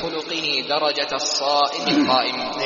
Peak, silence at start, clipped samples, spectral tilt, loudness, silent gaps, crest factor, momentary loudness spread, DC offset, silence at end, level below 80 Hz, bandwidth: -4 dBFS; 0 s; under 0.1%; -1 dB/octave; -20 LUFS; none; 16 dB; 6 LU; under 0.1%; 0 s; -60 dBFS; 7.4 kHz